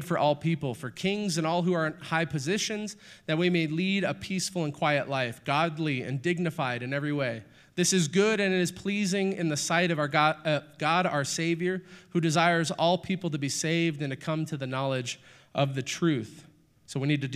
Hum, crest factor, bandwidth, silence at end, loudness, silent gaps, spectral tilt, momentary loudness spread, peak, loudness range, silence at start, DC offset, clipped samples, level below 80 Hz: none; 20 dB; 14.5 kHz; 0 s; -28 LUFS; none; -4.5 dB/octave; 8 LU; -8 dBFS; 3 LU; 0 s; under 0.1%; under 0.1%; -68 dBFS